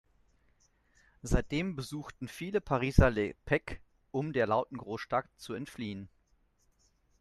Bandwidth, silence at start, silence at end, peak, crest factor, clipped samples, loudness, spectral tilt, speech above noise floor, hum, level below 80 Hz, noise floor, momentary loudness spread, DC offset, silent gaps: 13 kHz; 1.25 s; 1.15 s; -6 dBFS; 28 dB; under 0.1%; -33 LUFS; -6.5 dB/octave; 39 dB; none; -40 dBFS; -71 dBFS; 16 LU; under 0.1%; none